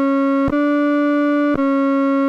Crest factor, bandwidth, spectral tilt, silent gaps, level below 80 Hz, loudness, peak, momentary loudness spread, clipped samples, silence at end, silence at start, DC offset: 10 dB; 5.8 kHz; -7.5 dB/octave; none; -46 dBFS; -17 LUFS; -6 dBFS; 0 LU; under 0.1%; 0 s; 0 s; under 0.1%